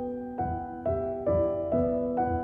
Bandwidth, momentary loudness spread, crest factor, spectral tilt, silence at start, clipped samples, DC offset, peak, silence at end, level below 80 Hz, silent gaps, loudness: 3.3 kHz; 6 LU; 12 dB; -11.5 dB/octave; 0 s; under 0.1%; under 0.1%; -16 dBFS; 0 s; -48 dBFS; none; -29 LUFS